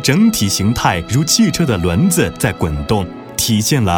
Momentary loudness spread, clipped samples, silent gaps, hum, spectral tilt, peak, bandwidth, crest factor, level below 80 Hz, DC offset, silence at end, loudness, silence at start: 6 LU; under 0.1%; none; none; -4.5 dB/octave; 0 dBFS; 19 kHz; 14 dB; -34 dBFS; under 0.1%; 0 s; -15 LUFS; 0 s